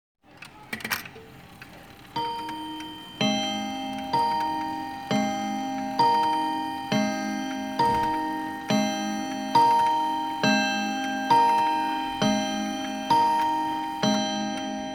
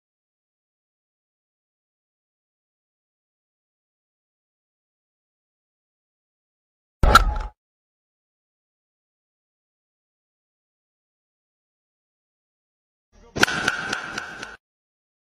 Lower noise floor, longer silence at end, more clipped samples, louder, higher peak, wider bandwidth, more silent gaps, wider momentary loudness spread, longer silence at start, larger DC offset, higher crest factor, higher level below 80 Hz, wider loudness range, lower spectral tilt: second, -47 dBFS vs under -90 dBFS; second, 0 s vs 0.8 s; neither; second, -25 LUFS vs -21 LUFS; second, -8 dBFS vs 0 dBFS; first, 19.5 kHz vs 13.5 kHz; second, none vs 7.58-13.12 s; second, 13 LU vs 21 LU; second, 0.35 s vs 7.05 s; neither; second, 18 dB vs 30 dB; second, -60 dBFS vs -36 dBFS; about the same, 7 LU vs 5 LU; about the same, -4 dB/octave vs -3.5 dB/octave